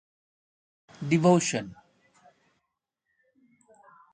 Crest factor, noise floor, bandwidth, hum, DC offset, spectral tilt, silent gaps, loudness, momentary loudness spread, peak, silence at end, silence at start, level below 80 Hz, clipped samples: 22 dB; -83 dBFS; 9.6 kHz; none; under 0.1%; -5.5 dB/octave; none; -24 LUFS; 18 LU; -8 dBFS; 2.4 s; 1 s; -70 dBFS; under 0.1%